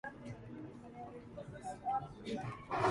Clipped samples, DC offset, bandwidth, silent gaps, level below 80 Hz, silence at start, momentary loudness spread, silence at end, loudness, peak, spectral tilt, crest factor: under 0.1%; under 0.1%; 11.5 kHz; none; -64 dBFS; 0.05 s; 11 LU; 0 s; -44 LUFS; -20 dBFS; -6 dB/octave; 22 dB